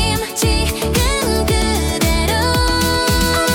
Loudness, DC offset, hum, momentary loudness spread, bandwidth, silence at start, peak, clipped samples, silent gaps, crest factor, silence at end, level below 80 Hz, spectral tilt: -16 LUFS; under 0.1%; none; 3 LU; 18 kHz; 0 s; -4 dBFS; under 0.1%; none; 12 dB; 0 s; -22 dBFS; -4 dB/octave